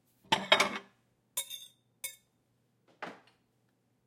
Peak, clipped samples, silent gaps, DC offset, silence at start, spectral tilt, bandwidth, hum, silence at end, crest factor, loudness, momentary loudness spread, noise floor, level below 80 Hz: -8 dBFS; under 0.1%; none; under 0.1%; 0.3 s; -1 dB/octave; 16.5 kHz; none; 0.9 s; 30 dB; -31 LUFS; 20 LU; -74 dBFS; -80 dBFS